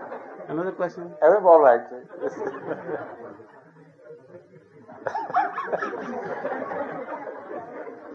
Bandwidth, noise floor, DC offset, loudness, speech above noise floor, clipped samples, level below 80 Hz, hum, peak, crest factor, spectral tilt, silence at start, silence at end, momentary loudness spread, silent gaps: 6.8 kHz; -51 dBFS; under 0.1%; -24 LUFS; 28 dB; under 0.1%; -78 dBFS; none; -2 dBFS; 22 dB; -7 dB/octave; 0 s; 0 s; 22 LU; none